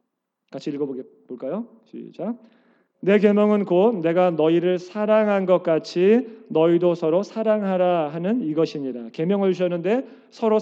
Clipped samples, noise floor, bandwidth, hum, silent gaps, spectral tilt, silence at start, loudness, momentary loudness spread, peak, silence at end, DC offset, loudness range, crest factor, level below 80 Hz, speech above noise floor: under 0.1%; -76 dBFS; 7.6 kHz; none; none; -8 dB/octave; 0.55 s; -21 LUFS; 14 LU; -4 dBFS; 0 s; under 0.1%; 4 LU; 16 dB; -88 dBFS; 55 dB